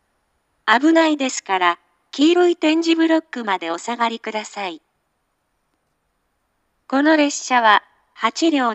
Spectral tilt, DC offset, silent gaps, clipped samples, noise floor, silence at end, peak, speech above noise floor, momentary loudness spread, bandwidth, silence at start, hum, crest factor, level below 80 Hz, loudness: -2 dB/octave; under 0.1%; none; under 0.1%; -70 dBFS; 0 s; 0 dBFS; 53 dB; 12 LU; 8.4 kHz; 0.65 s; none; 20 dB; -78 dBFS; -18 LUFS